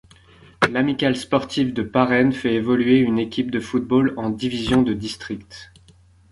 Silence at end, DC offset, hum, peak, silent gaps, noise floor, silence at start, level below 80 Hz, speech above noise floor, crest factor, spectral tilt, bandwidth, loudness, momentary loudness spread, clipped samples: 0.65 s; under 0.1%; none; -2 dBFS; none; -52 dBFS; 0.6 s; -48 dBFS; 32 dB; 18 dB; -6 dB/octave; 11.5 kHz; -20 LUFS; 12 LU; under 0.1%